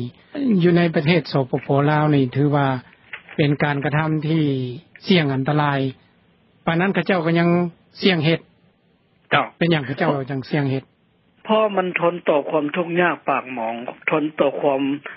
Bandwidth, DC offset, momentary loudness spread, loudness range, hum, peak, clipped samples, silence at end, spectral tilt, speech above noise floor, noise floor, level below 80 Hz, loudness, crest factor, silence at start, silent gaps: 5.8 kHz; under 0.1%; 9 LU; 3 LU; none; -2 dBFS; under 0.1%; 0 s; -11.5 dB/octave; 41 dB; -60 dBFS; -60 dBFS; -20 LUFS; 18 dB; 0 s; none